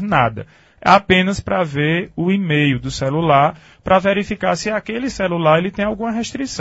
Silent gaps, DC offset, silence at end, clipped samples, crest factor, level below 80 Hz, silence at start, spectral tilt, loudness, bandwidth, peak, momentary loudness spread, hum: none; under 0.1%; 0 s; under 0.1%; 18 dB; -42 dBFS; 0 s; -5.5 dB/octave; -17 LUFS; 8 kHz; 0 dBFS; 8 LU; none